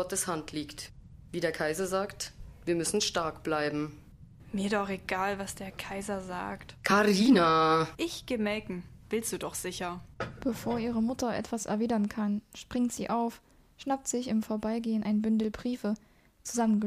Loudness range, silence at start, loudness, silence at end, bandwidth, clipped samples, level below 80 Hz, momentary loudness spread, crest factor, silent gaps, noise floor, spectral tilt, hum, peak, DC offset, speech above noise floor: 6 LU; 0 s; -31 LUFS; 0 s; 15.5 kHz; under 0.1%; -56 dBFS; 14 LU; 20 dB; none; -51 dBFS; -4.5 dB/octave; none; -12 dBFS; under 0.1%; 21 dB